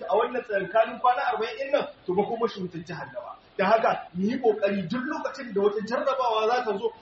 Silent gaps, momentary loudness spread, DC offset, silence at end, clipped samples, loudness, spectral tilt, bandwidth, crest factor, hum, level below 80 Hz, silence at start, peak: none; 12 LU; under 0.1%; 0.05 s; under 0.1%; -26 LUFS; -3.5 dB/octave; 7.2 kHz; 18 dB; none; -68 dBFS; 0 s; -8 dBFS